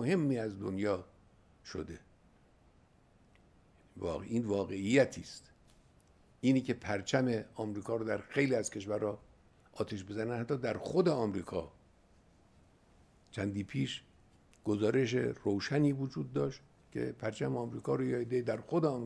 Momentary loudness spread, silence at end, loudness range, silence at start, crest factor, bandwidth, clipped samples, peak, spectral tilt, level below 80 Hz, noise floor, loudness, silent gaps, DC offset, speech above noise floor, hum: 13 LU; 0 s; 8 LU; 0 s; 22 dB; 11 kHz; under 0.1%; -14 dBFS; -6.5 dB/octave; -66 dBFS; -66 dBFS; -35 LUFS; none; under 0.1%; 32 dB; none